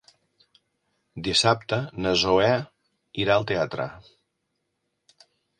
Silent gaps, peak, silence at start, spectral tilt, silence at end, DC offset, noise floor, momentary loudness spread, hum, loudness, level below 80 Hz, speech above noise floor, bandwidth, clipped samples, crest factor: none; -6 dBFS; 1.15 s; -4 dB/octave; 1.6 s; under 0.1%; -78 dBFS; 15 LU; none; -23 LUFS; -54 dBFS; 54 dB; 11 kHz; under 0.1%; 22 dB